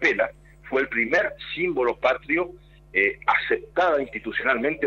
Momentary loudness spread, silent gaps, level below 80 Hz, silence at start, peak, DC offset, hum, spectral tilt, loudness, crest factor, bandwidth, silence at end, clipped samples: 6 LU; none; -52 dBFS; 0 s; -6 dBFS; under 0.1%; none; -5 dB/octave; -24 LUFS; 18 dB; 7.2 kHz; 0 s; under 0.1%